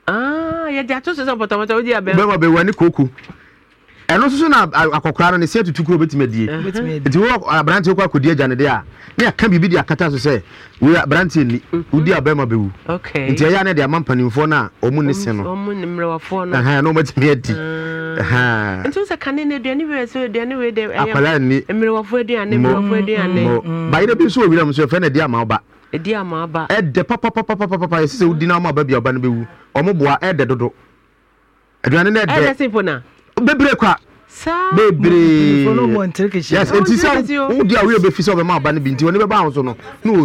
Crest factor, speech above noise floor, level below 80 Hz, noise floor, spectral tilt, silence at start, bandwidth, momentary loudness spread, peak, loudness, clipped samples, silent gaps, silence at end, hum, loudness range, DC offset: 12 dB; 40 dB; -44 dBFS; -55 dBFS; -6.5 dB/octave; 0.05 s; 12.5 kHz; 9 LU; -4 dBFS; -15 LUFS; under 0.1%; none; 0 s; none; 4 LU; under 0.1%